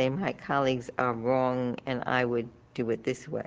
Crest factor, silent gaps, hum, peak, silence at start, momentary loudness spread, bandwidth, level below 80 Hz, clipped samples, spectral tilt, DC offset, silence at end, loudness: 20 dB; none; none; -10 dBFS; 0 s; 6 LU; 9.4 kHz; -62 dBFS; under 0.1%; -6.5 dB/octave; under 0.1%; 0 s; -29 LUFS